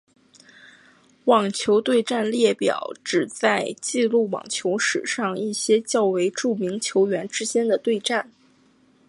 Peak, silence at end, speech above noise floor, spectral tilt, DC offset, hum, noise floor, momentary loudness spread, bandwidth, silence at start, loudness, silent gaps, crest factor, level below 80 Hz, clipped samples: -4 dBFS; 0.85 s; 37 dB; -3.5 dB/octave; under 0.1%; none; -58 dBFS; 6 LU; 11.5 kHz; 1.25 s; -22 LUFS; none; 18 dB; -72 dBFS; under 0.1%